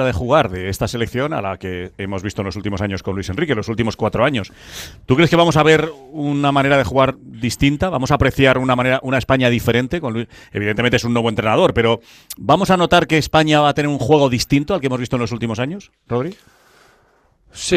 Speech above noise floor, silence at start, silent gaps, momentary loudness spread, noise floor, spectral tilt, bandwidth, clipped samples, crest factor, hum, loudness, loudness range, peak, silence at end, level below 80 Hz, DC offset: 39 dB; 0 s; none; 12 LU; -56 dBFS; -5.5 dB/octave; 15 kHz; under 0.1%; 16 dB; none; -17 LUFS; 6 LU; 0 dBFS; 0 s; -38 dBFS; under 0.1%